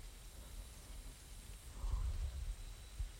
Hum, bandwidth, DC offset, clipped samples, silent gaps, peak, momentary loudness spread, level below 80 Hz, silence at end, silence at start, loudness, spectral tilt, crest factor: none; 16.5 kHz; under 0.1%; under 0.1%; none; -28 dBFS; 11 LU; -46 dBFS; 0 s; 0 s; -49 LUFS; -4 dB/octave; 16 dB